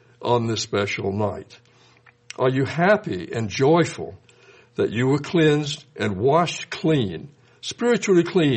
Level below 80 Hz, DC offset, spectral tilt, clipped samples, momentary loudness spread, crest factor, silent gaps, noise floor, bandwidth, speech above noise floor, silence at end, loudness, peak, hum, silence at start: -60 dBFS; under 0.1%; -5.5 dB/octave; under 0.1%; 14 LU; 18 dB; none; -55 dBFS; 8.8 kHz; 33 dB; 0 s; -22 LUFS; -4 dBFS; none; 0.2 s